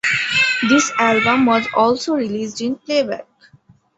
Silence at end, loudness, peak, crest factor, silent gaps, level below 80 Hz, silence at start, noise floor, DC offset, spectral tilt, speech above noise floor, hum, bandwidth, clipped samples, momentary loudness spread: 0.75 s; -16 LUFS; -2 dBFS; 16 dB; none; -58 dBFS; 0.05 s; -52 dBFS; under 0.1%; -3 dB/octave; 35 dB; none; 8.2 kHz; under 0.1%; 9 LU